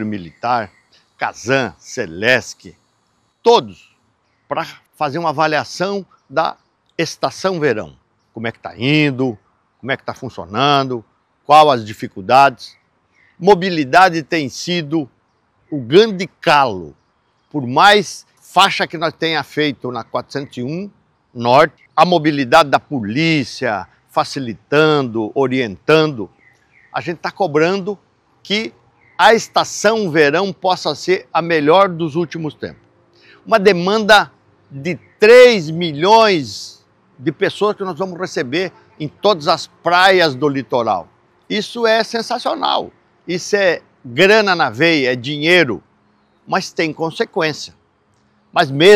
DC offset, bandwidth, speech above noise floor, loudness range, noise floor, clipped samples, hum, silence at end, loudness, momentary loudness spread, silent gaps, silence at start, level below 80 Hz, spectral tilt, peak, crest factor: under 0.1%; 17 kHz; 47 dB; 7 LU; -62 dBFS; 0.3%; none; 0 s; -15 LUFS; 16 LU; none; 0 s; -58 dBFS; -4.5 dB/octave; 0 dBFS; 16 dB